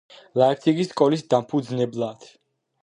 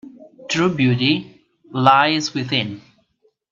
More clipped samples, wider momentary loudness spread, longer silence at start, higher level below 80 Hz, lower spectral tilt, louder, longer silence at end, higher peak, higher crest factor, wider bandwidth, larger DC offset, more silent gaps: neither; second, 10 LU vs 16 LU; first, 0.35 s vs 0.05 s; second, -70 dBFS vs -60 dBFS; first, -7 dB/octave vs -5 dB/octave; second, -22 LUFS vs -18 LUFS; second, 0.6 s vs 0.75 s; second, -4 dBFS vs 0 dBFS; about the same, 20 dB vs 20 dB; first, 10.5 kHz vs 7.6 kHz; neither; neither